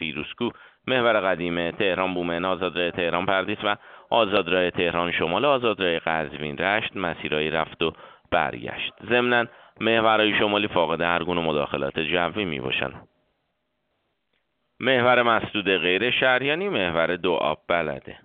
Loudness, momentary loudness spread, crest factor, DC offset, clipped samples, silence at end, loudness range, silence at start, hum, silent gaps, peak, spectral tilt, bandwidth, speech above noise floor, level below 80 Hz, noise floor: -23 LUFS; 8 LU; 20 dB; under 0.1%; under 0.1%; 0.1 s; 4 LU; 0 s; none; none; -4 dBFS; -2 dB/octave; 4.7 kHz; 52 dB; -56 dBFS; -75 dBFS